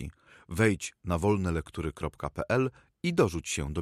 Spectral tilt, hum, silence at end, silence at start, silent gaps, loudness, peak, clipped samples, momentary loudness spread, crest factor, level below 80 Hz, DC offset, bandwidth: -5.5 dB/octave; none; 0 s; 0 s; none; -30 LUFS; -10 dBFS; under 0.1%; 9 LU; 20 dB; -46 dBFS; under 0.1%; 15.5 kHz